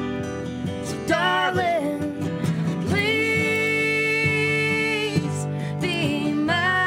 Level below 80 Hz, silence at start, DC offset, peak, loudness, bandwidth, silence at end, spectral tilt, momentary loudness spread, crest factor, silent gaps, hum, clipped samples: -54 dBFS; 0 s; under 0.1%; -8 dBFS; -22 LUFS; 16 kHz; 0 s; -5 dB/octave; 9 LU; 16 dB; none; none; under 0.1%